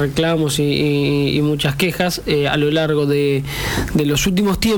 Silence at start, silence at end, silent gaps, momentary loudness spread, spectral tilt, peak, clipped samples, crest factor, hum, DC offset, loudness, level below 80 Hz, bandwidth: 0 s; 0 s; none; 3 LU; -5 dB/octave; -6 dBFS; under 0.1%; 12 dB; none; under 0.1%; -17 LUFS; -34 dBFS; 20 kHz